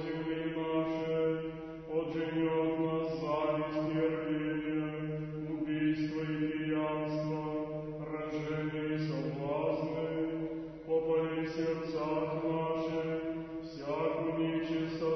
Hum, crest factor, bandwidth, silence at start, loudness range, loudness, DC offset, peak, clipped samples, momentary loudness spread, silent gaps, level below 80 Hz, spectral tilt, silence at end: none; 14 dB; 6.2 kHz; 0 s; 2 LU; -35 LUFS; under 0.1%; -20 dBFS; under 0.1%; 6 LU; none; -62 dBFS; -6 dB/octave; 0 s